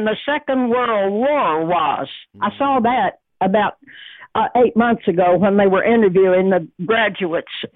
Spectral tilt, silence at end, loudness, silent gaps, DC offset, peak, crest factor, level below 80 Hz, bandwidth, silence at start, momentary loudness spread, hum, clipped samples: -9.5 dB/octave; 0.1 s; -17 LUFS; none; under 0.1%; -4 dBFS; 12 dB; -54 dBFS; 4.1 kHz; 0 s; 9 LU; none; under 0.1%